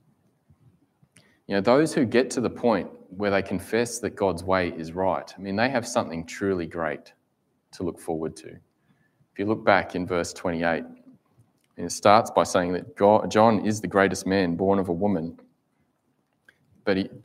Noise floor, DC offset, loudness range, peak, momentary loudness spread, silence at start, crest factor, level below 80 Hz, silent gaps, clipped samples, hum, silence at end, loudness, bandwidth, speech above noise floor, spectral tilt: -71 dBFS; under 0.1%; 7 LU; -2 dBFS; 13 LU; 1.5 s; 24 dB; -60 dBFS; none; under 0.1%; none; 0.05 s; -24 LUFS; 16 kHz; 47 dB; -5 dB/octave